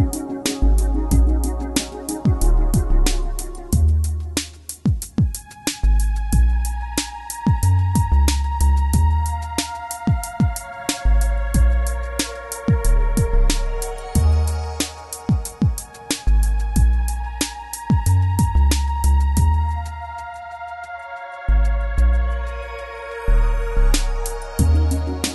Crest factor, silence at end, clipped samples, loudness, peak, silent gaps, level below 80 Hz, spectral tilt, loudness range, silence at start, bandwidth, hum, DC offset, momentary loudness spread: 14 dB; 0 s; under 0.1%; -21 LUFS; -4 dBFS; none; -20 dBFS; -5 dB/octave; 3 LU; 0 s; 12 kHz; none; under 0.1%; 11 LU